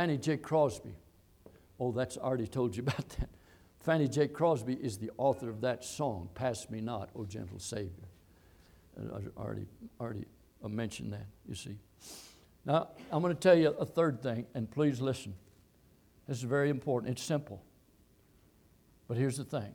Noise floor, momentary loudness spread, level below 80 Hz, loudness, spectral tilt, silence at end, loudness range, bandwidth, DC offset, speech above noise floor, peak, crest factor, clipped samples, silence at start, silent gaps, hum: -65 dBFS; 18 LU; -56 dBFS; -34 LUFS; -6 dB/octave; 0 s; 11 LU; 18.5 kHz; under 0.1%; 32 dB; -14 dBFS; 22 dB; under 0.1%; 0 s; none; none